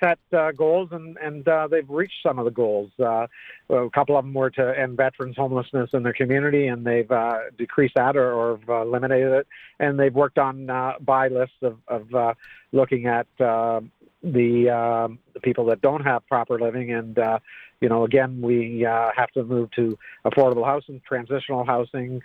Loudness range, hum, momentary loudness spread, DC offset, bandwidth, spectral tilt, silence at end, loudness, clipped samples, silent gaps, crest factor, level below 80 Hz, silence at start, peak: 2 LU; none; 8 LU; under 0.1%; 4.5 kHz; -9.5 dB/octave; 0.05 s; -22 LUFS; under 0.1%; none; 18 dB; -64 dBFS; 0 s; -6 dBFS